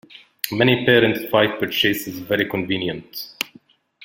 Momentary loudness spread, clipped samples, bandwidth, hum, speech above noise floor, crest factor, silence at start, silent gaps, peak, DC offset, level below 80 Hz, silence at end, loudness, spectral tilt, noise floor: 14 LU; under 0.1%; 17 kHz; none; 32 dB; 22 dB; 0.15 s; none; 0 dBFS; under 0.1%; -56 dBFS; 0.6 s; -20 LUFS; -5 dB/octave; -52 dBFS